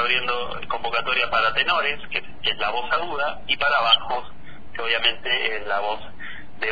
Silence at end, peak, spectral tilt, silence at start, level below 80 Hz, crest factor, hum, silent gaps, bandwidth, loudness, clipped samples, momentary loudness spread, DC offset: 0 s; -6 dBFS; -4 dB/octave; 0 s; -50 dBFS; 18 dB; none; none; 5 kHz; -22 LUFS; under 0.1%; 11 LU; 4%